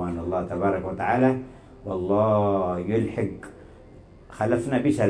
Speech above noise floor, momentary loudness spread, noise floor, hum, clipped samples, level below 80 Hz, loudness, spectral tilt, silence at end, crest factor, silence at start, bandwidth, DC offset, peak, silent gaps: 24 dB; 12 LU; -48 dBFS; none; under 0.1%; -50 dBFS; -25 LUFS; -8 dB/octave; 0 s; 16 dB; 0 s; 11 kHz; under 0.1%; -8 dBFS; none